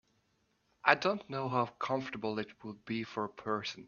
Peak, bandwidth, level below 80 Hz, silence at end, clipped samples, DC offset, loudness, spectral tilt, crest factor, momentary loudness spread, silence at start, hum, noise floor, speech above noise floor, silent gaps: -8 dBFS; 7.2 kHz; -74 dBFS; 0 s; under 0.1%; under 0.1%; -34 LUFS; -5.5 dB/octave; 28 dB; 11 LU; 0.85 s; none; -76 dBFS; 40 dB; none